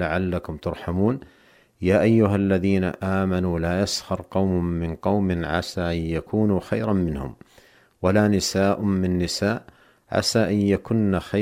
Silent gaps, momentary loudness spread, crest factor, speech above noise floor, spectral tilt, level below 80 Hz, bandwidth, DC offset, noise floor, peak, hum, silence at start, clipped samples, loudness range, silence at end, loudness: none; 8 LU; 18 dB; 33 dB; -6 dB/octave; -44 dBFS; 15.5 kHz; under 0.1%; -55 dBFS; -6 dBFS; none; 0 s; under 0.1%; 2 LU; 0 s; -23 LUFS